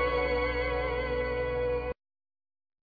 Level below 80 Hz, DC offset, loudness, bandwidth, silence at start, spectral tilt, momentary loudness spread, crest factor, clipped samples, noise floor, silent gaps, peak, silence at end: -40 dBFS; under 0.1%; -31 LUFS; 5 kHz; 0 s; -7.5 dB/octave; 6 LU; 14 dB; under 0.1%; under -90 dBFS; none; -18 dBFS; 1 s